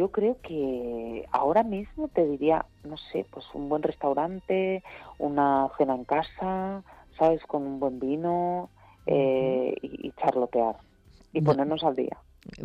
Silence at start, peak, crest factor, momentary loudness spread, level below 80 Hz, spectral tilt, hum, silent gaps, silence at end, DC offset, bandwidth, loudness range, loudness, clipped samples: 0 s; -10 dBFS; 16 dB; 11 LU; -56 dBFS; -8.5 dB/octave; none; none; 0 s; under 0.1%; 7.8 kHz; 1 LU; -28 LUFS; under 0.1%